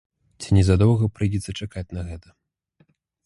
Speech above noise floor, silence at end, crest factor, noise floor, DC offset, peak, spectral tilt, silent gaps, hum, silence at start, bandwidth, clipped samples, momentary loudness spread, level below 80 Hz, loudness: 43 dB; 1.05 s; 18 dB; -63 dBFS; under 0.1%; -4 dBFS; -7 dB/octave; none; none; 0.4 s; 11.5 kHz; under 0.1%; 18 LU; -36 dBFS; -22 LUFS